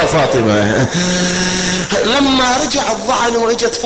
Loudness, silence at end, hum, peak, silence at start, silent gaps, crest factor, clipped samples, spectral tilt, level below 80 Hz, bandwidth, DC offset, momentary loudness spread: -13 LUFS; 0 s; none; -2 dBFS; 0 s; none; 10 dB; under 0.1%; -3.5 dB/octave; -36 dBFS; 9 kHz; 0.6%; 4 LU